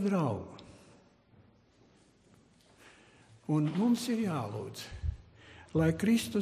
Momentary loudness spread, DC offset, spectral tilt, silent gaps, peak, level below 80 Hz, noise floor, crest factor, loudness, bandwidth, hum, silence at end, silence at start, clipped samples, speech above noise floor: 21 LU; under 0.1%; -6.5 dB/octave; none; -18 dBFS; -50 dBFS; -64 dBFS; 16 dB; -32 LUFS; 15 kHz; none; 0 s; 0 s; under 0.1%; 34 dB